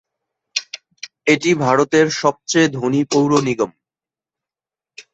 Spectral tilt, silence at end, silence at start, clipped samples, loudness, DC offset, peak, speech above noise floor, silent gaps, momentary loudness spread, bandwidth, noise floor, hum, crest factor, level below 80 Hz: -4.5 dB/octave; 0.15 s; 0.55 s; under 0.1%; -17 LUFS; under 0.1%; -2 dBFS; over 74 dB; none; 10 LU; 8.2 kHz; under -90 dBFS; none; 18 dB; -60 dBFS